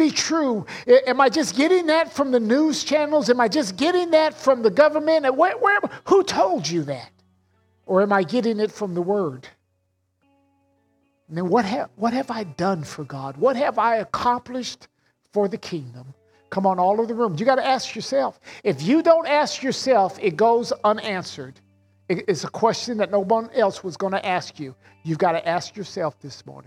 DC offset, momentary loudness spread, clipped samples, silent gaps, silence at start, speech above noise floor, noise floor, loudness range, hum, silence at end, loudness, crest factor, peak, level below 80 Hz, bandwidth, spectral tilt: under 0.1%; 13 LU; under 0.1%; none; 0 s; 50 dB; -70 dBFS; 7 LU; none; 0.05 s; -21 LUFS; 18 dB; -2 dBFS; -66 dBFS; 14 kHz; -4.5 dB/octave